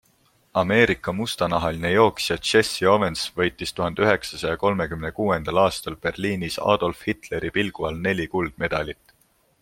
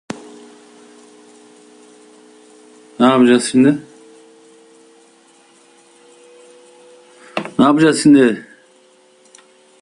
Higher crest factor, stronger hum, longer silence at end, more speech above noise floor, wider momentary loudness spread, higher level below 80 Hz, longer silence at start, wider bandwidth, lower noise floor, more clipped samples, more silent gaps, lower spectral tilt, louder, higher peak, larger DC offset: about the same, 20 dB vs 18 dB; neither; second, 0.7 s vs 1.4 s; about the same, 40 dB vs 39 dB; second, 9 LU vs 17 LU; first, -48 dBFS vs -60 dBFS; first, 0.55 s vs 0.15 s; first, 16.5 kHz vs 11 kHz; first, -63 dBFS vs -51 dBFS; neither; neither; about the same, -4.5 dB/octave vs -5 dB/octave; second, -23 LUFS vs -13 LUFS; about the same, -2 dBFS vs 0 dBFS; neither